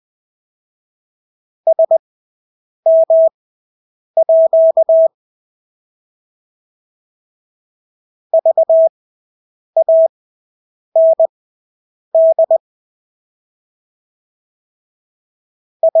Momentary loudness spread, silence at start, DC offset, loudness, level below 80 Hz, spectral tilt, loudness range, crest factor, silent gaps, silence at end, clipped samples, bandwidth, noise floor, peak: 7 LU; 1.65 s; under 0.1%; -13 LUFS; -84 dBFS; -9 dB/octave; 6 LU; 12 dB; 1.99-2.83 s, 3.34-4.14 s, 5.14-8.30 s, 8.89-9.73 s, 10.09-10.92 s, 11.29-12.12 s, 12.60-15.80 s; 0 s; under 0.1%; 1 kHz; under -90 dBFS; -4 dBFS